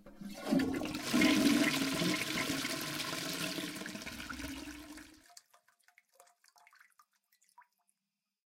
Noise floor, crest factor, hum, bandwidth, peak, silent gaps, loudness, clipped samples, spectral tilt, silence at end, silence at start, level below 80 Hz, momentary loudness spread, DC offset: -90 dBFS; 20 dB; none; 17 kHz; -18 dBFS; none; -34 LUFS; under 0.1%; -3.5 dB/octave; 3.4 s; 0.05 s; -64 dBFS; 19 LU; under 0.1%